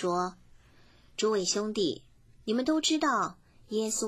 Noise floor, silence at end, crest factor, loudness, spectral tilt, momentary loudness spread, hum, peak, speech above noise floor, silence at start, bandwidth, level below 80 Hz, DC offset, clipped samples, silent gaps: -58 dBFS; 0 s; 16 dB; -30 LUFS; -3 dB/octave; 11 LU; none; -14 dBFS; 29 dB; 0 s; 16 kHz; -64 dBFS; under 0.1%; under 0.1%; none